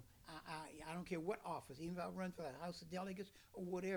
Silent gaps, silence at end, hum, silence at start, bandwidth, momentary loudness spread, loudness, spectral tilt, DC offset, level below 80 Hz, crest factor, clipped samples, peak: none; 0 s; none; 0 s; over 20 kHz; 7 LU; -49 LUFS; -6 dB/octave; under 0.1%; -72 dBFS; 16 dB; under 0.1%; -32 dBFS